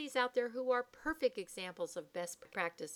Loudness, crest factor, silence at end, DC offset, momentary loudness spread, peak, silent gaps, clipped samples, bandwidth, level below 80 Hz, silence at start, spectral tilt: -39 LUFS; 20 dB; 0 s; under 0.1%; 9 LU; -18 dBFS; none; under 0.1%; 17 kHz; -70 dBFS; 0 s; -3 dB/octave